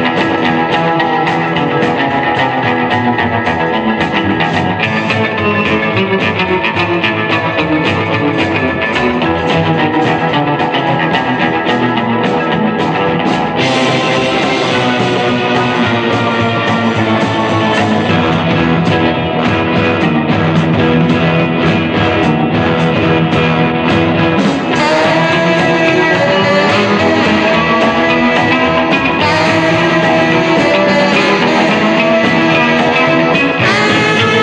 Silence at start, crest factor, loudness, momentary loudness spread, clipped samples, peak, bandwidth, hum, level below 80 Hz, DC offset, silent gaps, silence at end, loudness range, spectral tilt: 0 s; 12 dB; -11 LUFS; 3 LU; under 0.1%; 0 dBFS; 9.4 kHz; none; -40 dBFS; under 0.1%; none; 0 s; 3 LU; -6 dB/octave